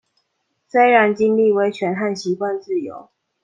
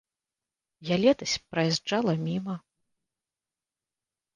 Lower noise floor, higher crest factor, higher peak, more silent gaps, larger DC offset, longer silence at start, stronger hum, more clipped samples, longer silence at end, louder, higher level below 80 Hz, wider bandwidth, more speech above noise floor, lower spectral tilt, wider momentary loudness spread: second, -71 dBFS vs under -90 dBFS; about the same, 18 dB vs 20 dB; first, -2 dBFS vs -10 dBFS; neither; neither; about the same, 0.75 s vs 0.8 s; neither; neither; second, 0.4 s vs 1.75 s; first, -18 LUFS vs -27 LUFS; about the same, -68 dBFS vs -66 dBFS; about the same, 9 kHz vs 9.8 kHz; second, 54 dB vs over 63 dB; about the same, -6 dB/octave vs -5 dB/octave; second, 11 LU vs 14 LU